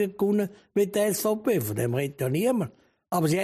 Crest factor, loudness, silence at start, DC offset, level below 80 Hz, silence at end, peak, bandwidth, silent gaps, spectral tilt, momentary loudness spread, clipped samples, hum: 14 dB; -26 LUFS; 0 s; under 0.1%; -64 dBFS; 0 s; -12 dBFS; 15.5 kHz; none; -6 dB/octave; 5 LU; under 0.1%; none